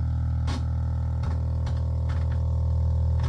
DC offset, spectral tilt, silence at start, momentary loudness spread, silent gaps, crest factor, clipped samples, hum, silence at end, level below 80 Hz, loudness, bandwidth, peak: under 0.1%; -8 dB/octave; 0 s; 3 LU; none; 8 dB; under 0.1%; none; 0 s; -32 dBFS; -27 LUFS; 6.2 kHz; -16 dBFS